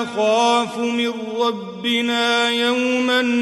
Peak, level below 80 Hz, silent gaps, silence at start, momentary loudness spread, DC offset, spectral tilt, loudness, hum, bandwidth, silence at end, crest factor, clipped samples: -6 dBFS; -68 dBFS; none; 0 s; 5 LU; under 0.1%; -3 dB/octave; -19 LUFS; none; 12 kHz; 0 s; 12 dB; under 0.1%